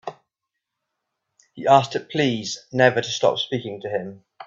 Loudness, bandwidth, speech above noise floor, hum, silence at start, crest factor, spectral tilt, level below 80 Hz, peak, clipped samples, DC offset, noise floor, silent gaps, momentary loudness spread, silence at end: -21 LUFS; 7.8 kHz; 61 dB; none; 0.05 s; 22 dB; -4.5 dB/octave; -64 dBFS; 0 dBFS; under 0.1%; under 0.1%; -82 dBFS; none; 11 LU; 0 s